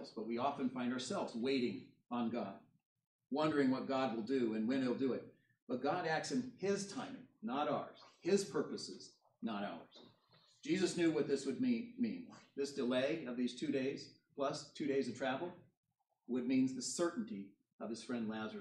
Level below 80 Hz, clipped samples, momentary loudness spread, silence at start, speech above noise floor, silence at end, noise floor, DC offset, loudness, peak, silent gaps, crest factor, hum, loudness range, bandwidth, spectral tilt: -88 dBFS; under 0.1%; 13 LU; 0 s; 32 dB; 0 s; -71 dBFS; under 0.1%; -39 LUFS; -22 dBFS; 2.86-2.96 s, 3.07-3.19 s, 5.62-5.67 s, 15.77-15.83 s, 17.73-17.79 s; 18 dB; none; 3 LU; 11.5 kHz; -5 dB/octave